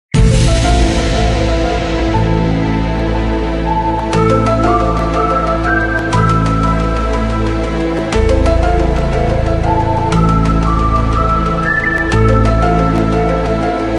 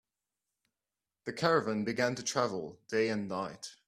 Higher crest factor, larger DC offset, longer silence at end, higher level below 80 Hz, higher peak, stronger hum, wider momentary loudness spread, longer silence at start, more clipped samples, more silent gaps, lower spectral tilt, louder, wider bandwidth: second, 12 dB vs 22 dB; neither; second, 0 s vs 0.15 s; first, -18 dBFS vs -74 dBFS; first, 0 dBFS vs -12 dBFS; neither; second, 4 LU vs 12 LU; second, 0.15 s vs 1.25 s; neither; neither; first, -6.5 dB/octave vs -4.5 dB/octave; first, -13 LUFS vs -33 LUFS; second, 11 kHz vs 14 kHz